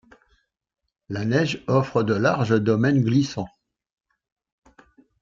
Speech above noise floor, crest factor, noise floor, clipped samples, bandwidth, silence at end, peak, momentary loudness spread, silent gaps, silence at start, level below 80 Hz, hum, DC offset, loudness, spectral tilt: 46 dB; 18 dB; -67 dBFS; under 0.1%; 7.6 kHz; 1.75 s; -6 dBFS; 11 LU; none; 1.1 s; -60 dBFS; none; under 0.1%; -22 LUFS; -7 dB/octave